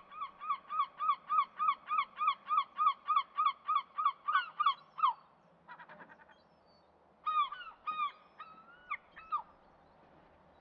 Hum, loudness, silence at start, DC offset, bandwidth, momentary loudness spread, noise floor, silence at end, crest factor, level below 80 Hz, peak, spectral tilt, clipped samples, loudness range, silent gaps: none; -35 LUFS; 0.1 s; under 0.1%; 5.2 kHz; 22 LU; -66 dBFS; 1.2 s; 18 dB; -82 dBFS; -18 dBFS; 2.5 dB/octave; under 0.1%; 8 LU; none